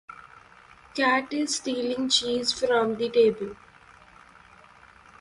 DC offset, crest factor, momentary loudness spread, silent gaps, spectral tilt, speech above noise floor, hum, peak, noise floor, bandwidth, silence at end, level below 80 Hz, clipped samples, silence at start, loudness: under 0.1%; 18 dB; 15 LU; none; -2.5 dB/octave; 28 dB; none; -10 dBFS; -53 dBFS; 11.5 kHz; 1.65 s; -62 dBFS; under 0.1%; 0.1 s; -24 LUFS